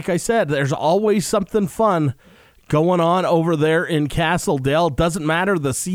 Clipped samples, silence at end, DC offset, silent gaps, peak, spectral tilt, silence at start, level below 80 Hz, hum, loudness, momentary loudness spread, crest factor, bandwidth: under 0.1%; 0 s; under 0.1%; none; -4 dBFS; -5.5 dB/octave; 0 s; -42 dBFS; none; -19 LUFS; 4 LU; 14 dB; 19.5 kHz